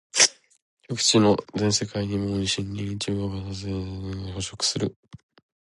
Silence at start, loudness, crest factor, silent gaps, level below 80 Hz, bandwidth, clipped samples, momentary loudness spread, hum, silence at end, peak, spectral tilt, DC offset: 0.15 s; -24 LUFS; 24 dB; 0.62-0.77 s, 4.96-5.03 s; -48 dBFS; 11.5 kHz; under 0.1%; 14 LU; none; 0.5 s; -2 dBFS; -3.5 dB/octave; under 0.1%